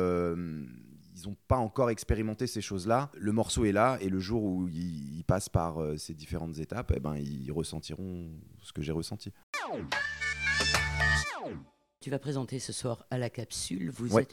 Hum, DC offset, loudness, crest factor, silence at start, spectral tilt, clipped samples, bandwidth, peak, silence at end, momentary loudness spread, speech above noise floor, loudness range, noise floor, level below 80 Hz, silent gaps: none; under 0.1%; -32 LUFS; 22 dB; 0 s; -5 dB/octave; under 0.1%; 17.5 kHz; -12 dBFS; 0.05 s; 14 LU; 19 dB; 7 LU; -51 dBFS; -46 dBFS; 9.43-9.53 s